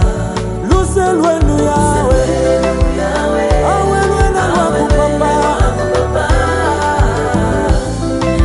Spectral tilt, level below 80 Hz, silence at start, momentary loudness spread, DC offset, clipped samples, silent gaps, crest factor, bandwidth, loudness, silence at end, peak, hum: -6 dB/octave; -18 dBFS; 0 s; 3 LU; under 0.1%; under 0.1%; none; 10 dB; 11.5 kHz; -13 LUFS; 0 s; -2 dBFS; none